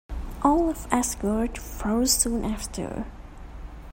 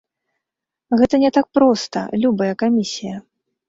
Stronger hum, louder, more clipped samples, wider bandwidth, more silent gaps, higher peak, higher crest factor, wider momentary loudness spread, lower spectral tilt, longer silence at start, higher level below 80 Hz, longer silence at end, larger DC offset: neither; second, -25 LUFS vs -18 LUFS; neither; first, 16.5 kHz vs 7.8 kHz; neither; second, -6 dBFS vs -2 dBFS; first, 22 dB vs 16 dB; first, 22 LU vs 12 LU; second, -3.5 dB/octave vs -5.5 dB/octave; second, 0.1 s vs 0.9 s; first, -36 dBFS vs -54 dBFS; second, 0 s vs 0.5 s; neither